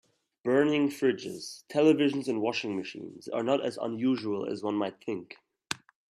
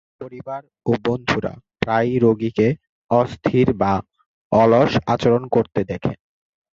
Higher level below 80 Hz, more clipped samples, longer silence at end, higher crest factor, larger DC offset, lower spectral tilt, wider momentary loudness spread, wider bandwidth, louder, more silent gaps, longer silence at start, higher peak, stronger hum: second, -76 dBFS vs -46 dBFS; neither; second, 0.35 s vs 0.6 s; about the same, 20 dB vs 18 dB; neither; second, -5.5 dB/octave vs -7.5 dB/octave; about the same, 14 LU vs 15 LU; first, 13.5 kHz vs 7.6 kHz; second, -30 LUFS vs -19 LUFS; second, none vs 2.89-3.09 s, 4.26-4.51 s; first, 0.45 s vs 0.2 s; second, -10 dBFS vs -2 dBFS; neither